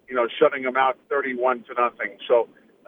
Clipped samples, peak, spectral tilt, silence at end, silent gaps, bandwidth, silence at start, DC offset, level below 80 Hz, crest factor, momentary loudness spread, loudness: under 0.1%; -4 dBFS; -6.5 dB/octave; 0.45 s; none; 3.8 kHz; 0.1 s; under 0.1%; -74 dBFS; 20 dB; 5 LU; -23 LUFS